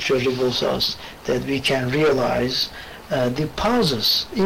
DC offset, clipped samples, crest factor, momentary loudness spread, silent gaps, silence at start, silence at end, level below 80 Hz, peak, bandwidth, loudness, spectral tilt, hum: under 0.1%; under 0.1%; 10 dB; 7 LU; none; 0 s; 0 s; -44 dBFS; -12 dBFS; 16 kHz; -21 LUFS; -4.5 dB/octave; none